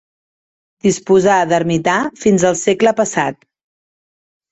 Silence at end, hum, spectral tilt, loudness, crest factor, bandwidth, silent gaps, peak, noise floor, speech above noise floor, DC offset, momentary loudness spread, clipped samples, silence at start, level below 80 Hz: 1.2 s; none; -5 dB/octave; -15 LUFS; 14 dB; 8.4 kHz; none; -2 dBFS; under -90 dBFS; over 76 dB; under 0.1%; 6 LU; under 0.1%; 0.85 s; -52 dBFS